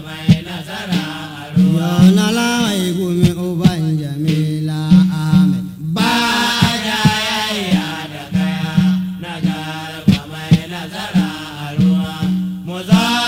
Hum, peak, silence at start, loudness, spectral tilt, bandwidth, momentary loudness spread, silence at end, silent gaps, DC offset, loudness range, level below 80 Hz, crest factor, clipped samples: none; 0 dBFS; 0 s; -16 LUFS; -5.5 dB/octave; 16.5 kHz; 11 LU; 0 s; none; under 0.1%; 4 LU; -42 dBFS; 16 dB; under 0.1%